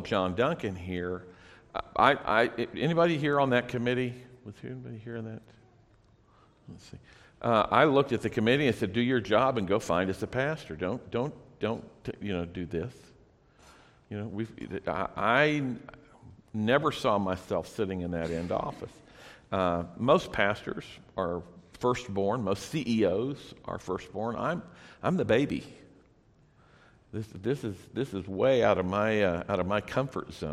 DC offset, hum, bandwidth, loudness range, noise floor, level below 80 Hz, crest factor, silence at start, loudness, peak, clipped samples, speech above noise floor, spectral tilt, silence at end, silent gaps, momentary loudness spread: under 0.1%; none; 14.5 kHz; 9 LU; -62 dBFS; -58 dBFS; 24 dB; 0 s; -29 LUFS; -6 dBFS; under 0.1%; 33 dB; -6.5 dB/octave; 0 s; none; 16 LU